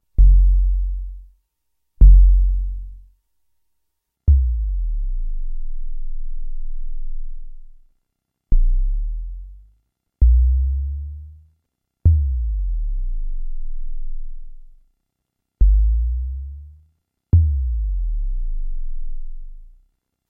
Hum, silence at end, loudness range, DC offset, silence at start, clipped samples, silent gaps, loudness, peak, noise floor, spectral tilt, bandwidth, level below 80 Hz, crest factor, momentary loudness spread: none; 0.65 s; 11 LU; under 0.1%; 0.2 s; under 0.1%; none; -21 LUFS; -2 dBFS; -78 dBFS; -12.5 dB/octave; 0.6 kHz; -18 dBFS; 18 dB; 21 LU